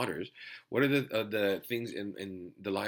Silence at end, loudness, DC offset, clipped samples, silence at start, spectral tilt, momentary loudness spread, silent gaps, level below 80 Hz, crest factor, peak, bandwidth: 0 s; -33 LUFS; under 0.1%; under 0.1%; 0 s; -5.5 dB/octave; 14 LU; none; -76 dBFS; 20 dB; -14 dBFS; 18 kHz